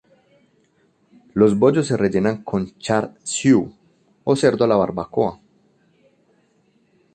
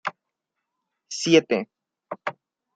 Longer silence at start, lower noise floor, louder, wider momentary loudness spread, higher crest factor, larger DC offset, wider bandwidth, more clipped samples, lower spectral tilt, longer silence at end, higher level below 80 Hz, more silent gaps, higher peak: first, 1.35 s vs 0.05 s; second, -61 dBFS vs -82 dBFS; first, -19 LUFS vs -23 LUFS; second, 9 LU vs 19 LU; about the same, 18 dB vs 22 dB; neither; about the same, 9.6 kHz vs 9.2 kHz; neither; first, -6 dB/octave vs -4 dB/octave; first, 1.8 s vs 0.45 s; first, -54 dBFS vs -72 dBFS; neither; about the same, -4 dBFS vs -4 dBFS